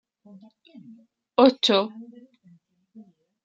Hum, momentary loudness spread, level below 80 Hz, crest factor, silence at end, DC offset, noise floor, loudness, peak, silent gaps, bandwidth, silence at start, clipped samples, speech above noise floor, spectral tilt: none; 17 LU; -76 dBFS; 24 dB; 1.4 s; under 0.1%; -58 dBFS; -21 LUFS; -4 dBFS; none; 7.8 kHz; 1.4 s; under 0.1%; 34 dB; -4.5 dB/octave